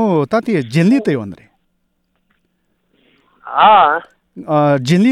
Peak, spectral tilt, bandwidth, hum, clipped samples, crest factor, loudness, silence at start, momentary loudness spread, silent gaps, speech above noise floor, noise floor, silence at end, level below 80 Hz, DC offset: 0 dBFS; -7 dB/octave; 12.5 kHz; none; under 0.1%; 14 dB; -13 LUFS; 0 s; 13 LU; none; 53 dB; -65 dBFS; 0 s; -58 dBFS; under 0.1%